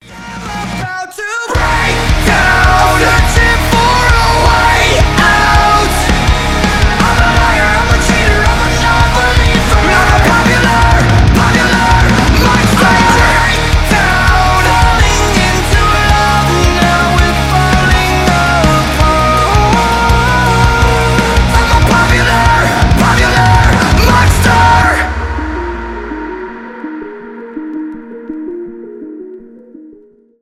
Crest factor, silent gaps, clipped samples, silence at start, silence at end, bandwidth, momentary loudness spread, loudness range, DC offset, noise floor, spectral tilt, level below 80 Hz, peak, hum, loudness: 10 dB; none; under 0.1%; 0.1 s; 0.5 s; 16 kHz; 15 LU; 7 LU; under 0.1%; -42 dBFS; -4.5 dB/octave; -16 dBFS; 0 dBFS; none; -9 LUFS